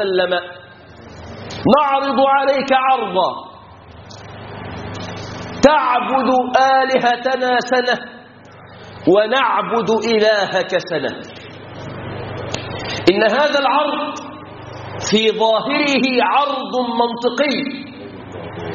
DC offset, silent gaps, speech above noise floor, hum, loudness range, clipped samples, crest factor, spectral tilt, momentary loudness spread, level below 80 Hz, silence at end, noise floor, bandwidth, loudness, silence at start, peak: under 0.1%; none; 25 dB; none; 4 LU; under 0.1%; 18 dB; -2.5 dB/octave; 20 LU; -50 dBFS; 0 s; -40 dBFS; 7.2 kHz; -16 LUFS; 0 s; 0 dBFS